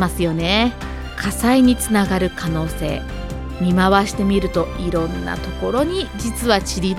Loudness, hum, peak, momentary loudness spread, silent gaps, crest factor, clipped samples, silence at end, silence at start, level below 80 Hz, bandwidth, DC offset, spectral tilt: -19 LUFS; none; 0 dBFS; 11 LU; none; 18 dB; under 0.1%; 0 s; 0 s; -30 dBFS; 16 kHz; under 0.1%; -5 dB/octave